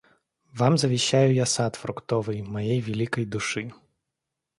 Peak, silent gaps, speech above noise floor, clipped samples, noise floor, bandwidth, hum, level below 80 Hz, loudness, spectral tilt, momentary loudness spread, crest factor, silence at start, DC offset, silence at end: -6 dBFS; none; 60 dB; under 0.1%; -84 dBFS; 11.5 kHz; none; -60 dBFS; -25 LUFS; -5 dB/octave; 11 LU; 20 dB; 0.55 s; under 0.1%; 0.85 s